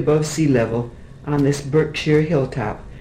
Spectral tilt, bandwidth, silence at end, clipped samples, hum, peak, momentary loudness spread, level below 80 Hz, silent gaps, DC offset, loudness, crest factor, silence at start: -6.5 dB/octave; 15 kHz; 0 s; under 0.1%; none; -4 dBFS; 10 LU; -40 dBFS; none; under 0.1%; -19 LUFS; 16 dB; 0 s